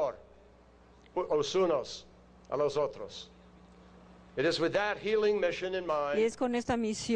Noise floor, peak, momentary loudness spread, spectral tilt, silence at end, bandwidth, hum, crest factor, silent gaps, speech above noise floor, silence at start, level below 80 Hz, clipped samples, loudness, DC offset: -59 dBFS; -18 dBFS; 15 LU; -4.5 dB/octave; 0 s; 10 kHz; none; 16 dB; none; 28 dB; 0 s; -62 dBFS; under 0.1%; -31 LUFS; under 0.1%